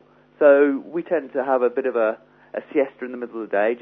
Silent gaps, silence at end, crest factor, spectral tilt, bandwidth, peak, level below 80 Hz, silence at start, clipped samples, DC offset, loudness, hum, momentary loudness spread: none; 0 s; 18 dB; -9 dB/octave; 3.9 kHz; -2 dBFS; -74 dBFS; 0.4 s; under 0.1%; under 0.1%; -21 LUFS; 50 Hz at -65 dBFS; 16 LU